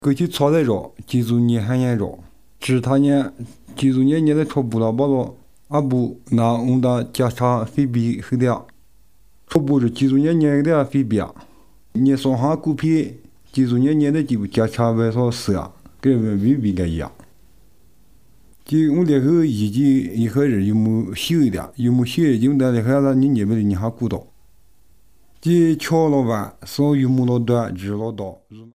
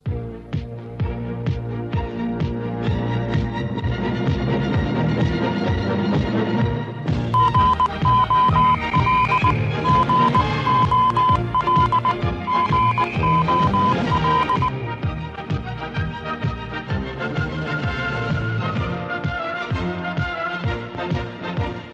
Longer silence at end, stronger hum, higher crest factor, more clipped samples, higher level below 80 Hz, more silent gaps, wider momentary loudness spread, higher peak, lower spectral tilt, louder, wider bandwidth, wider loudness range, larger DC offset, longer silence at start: about the same, 0.05 s vs 0 s; neither; about the same, 18 dB vs 16 dB; neither; second, -52 dBFS vs -36 dBFS; neither; about the same, 9 LU vs 10 LU; first, 0 dBFS vs -6 dBFS; about the same, -7.5 dB/octave vs -7.5 dB/octave; about the same, -19 LUFS vs -21 LUFS; first, 15.5 kHz vs 8 kHz; second, 3 LU vs 8 LU; first, 0.4% vs under 0.1%; about the same, 0.05 s vs 0.05 s